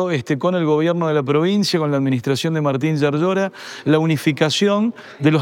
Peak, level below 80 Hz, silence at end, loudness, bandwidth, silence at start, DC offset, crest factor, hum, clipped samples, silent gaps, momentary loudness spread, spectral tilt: -2 dBFS; -70 dBFS; 0 s; -18 LUFS; 16.5 kHz; 0 s; under 0.1%; 16 dB; none; under 0.1%; none; 4 LU; -6 dB/octave